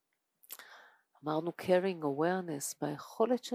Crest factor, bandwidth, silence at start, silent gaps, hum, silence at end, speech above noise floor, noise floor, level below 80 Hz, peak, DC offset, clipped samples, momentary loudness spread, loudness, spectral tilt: 20 dB; 16 kHz; 0.5 s; none; none; 0 s; 35 dB; -68 dBFS; -82 dBFS; -14 dBFS; under 0.1%; under 0.1%; 18 LU; -34 LUFS; -5 dB/octave